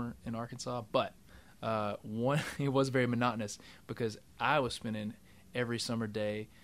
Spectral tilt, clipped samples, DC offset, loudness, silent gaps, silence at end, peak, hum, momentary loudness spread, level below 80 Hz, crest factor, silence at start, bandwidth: -5.5 dB/octave; under 0.1%; under 0.1%; -35 LUFS; none; 0.15 s; -14 dBFS; none; 11 LU; -64 dBFS; 20 dB; 0 s; 15.5 kHz